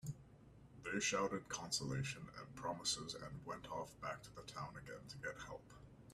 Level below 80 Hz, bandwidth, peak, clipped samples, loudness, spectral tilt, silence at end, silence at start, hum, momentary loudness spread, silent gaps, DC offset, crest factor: -68 dBFS; 14 kHz; -26 dBFS; under 0.1%; -45 LUFS; -3 dB/octave; 0 s; 0.05 s; none; 16 LU; none; under 0.1%; 20 dB